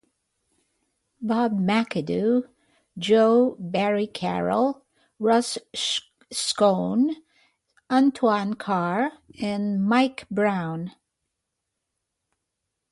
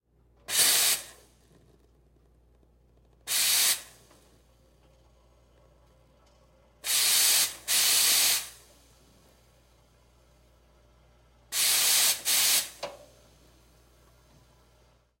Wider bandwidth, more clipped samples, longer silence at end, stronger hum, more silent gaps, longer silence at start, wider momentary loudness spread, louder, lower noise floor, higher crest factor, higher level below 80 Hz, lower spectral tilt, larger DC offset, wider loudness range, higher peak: second, 11.5 kHz vs 16.5 kHz; neither; second, 2 s vs 2.25 s; neither; neither; first, 1.2 s vs 0.5 s; second, 11 LU vs 17 LU; about the same, -24 LUFS vs -23 LUFS; first, -81 dBFS vs -63 dBFS; about the same, 18 dB vs 22 dB; about the same, -66 dBFS vs -64 dBFS; first, -5 dB/octave vs 2.5 dB/octave; neither; second, 4 LU vs 7 LU; first, -6 dBFS vs -10 dBFS